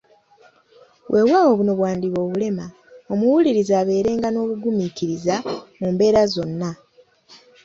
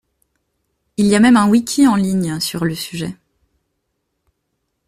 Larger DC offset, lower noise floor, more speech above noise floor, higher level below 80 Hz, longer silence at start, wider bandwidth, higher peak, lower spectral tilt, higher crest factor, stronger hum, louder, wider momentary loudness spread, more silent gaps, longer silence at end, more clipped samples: neither; second, -54 dBFS vs -72 dBFS; second, 35 dB vs 58 dB; about the same, -56 dBFS vs -52 dBFS; about the same, 1.1 s vs 1 s; second, 7.6 kHz vs 15 kHz; about the same, -4 dBFS vs -2 dBFS; first, -6.5 dB/octave vs -5 dB/octave; about the same, 16 dB vs 16 dB; neither; second, -20 LUFS vs -15 LUFS; second, 11 LU vs 15 LU; neither; second, 0.3 s vs 1.75 s; neither